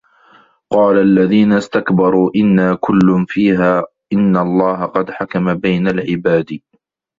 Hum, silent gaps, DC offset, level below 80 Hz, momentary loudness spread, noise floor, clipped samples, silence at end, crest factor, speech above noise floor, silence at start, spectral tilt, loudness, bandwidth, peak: none; none; under 0.1%; -50 dBFS; 8 LU; -49 dBFS; under 0.1%; 0.6 s; 14 dB; 36 dB; 0.7 s; -8.5 dB/octave; -14 LUFS; 7.6 kHz; 0 dBFS